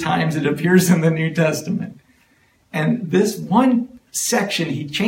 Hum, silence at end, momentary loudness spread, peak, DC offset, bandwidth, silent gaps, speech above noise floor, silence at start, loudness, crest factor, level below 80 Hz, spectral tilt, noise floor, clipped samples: none; 0 s; 10 LU; -2 dBFS; under 0.1%; 16.5 kHz; none; 40 dB; 0 s; -19 LUFS; 16 dB; -58 dBFS; -5 dB/octave; -58 dBFS; under 0.1%